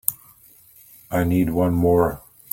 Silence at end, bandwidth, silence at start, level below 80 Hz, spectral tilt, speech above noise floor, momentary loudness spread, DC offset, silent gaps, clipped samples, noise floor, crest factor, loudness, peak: 0.35 s; 16.5 kHz; 0.1 s; -44 dBFS; -7 dB/octave; 32 dB; 15 LU; under 0.1%; none; under 0.1%; -51 dBFS; 22 dB; -21 LUFS; 0 dBFS